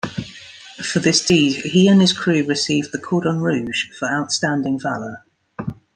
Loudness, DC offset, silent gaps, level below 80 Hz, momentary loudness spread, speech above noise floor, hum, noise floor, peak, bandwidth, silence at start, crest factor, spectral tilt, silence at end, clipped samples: -18 LUFS; under 0.1%; none; -56 dBFS; 17 LU; 22 dB; none; -40 dBFS; -2 dBFS; 10 kHz; 0.05 s; 18 dB; -4.5 dB/octave; 0.25 s; under 0.1%